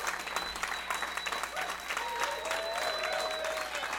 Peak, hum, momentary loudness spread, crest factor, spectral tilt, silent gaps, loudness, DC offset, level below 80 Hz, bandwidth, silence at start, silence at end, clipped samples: -14 dBFS; none; 3 LU; 22 dB; -0.5 dB/octave; none; -34 LUFS; under 0.1%; -60 dBFS; 19.5 kHz; 0 s; 0 s; under 0.1%